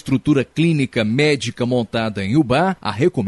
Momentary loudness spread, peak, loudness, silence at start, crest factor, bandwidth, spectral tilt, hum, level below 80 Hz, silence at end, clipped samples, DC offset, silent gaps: 4 LU; -4 dBFS; -18 LUFS; 0.05 s; 14 dB; 11.5 kHz; -6.5 dB/octave; none; -48 dBFS; 0 s; under 0.1%; under 0.1%; none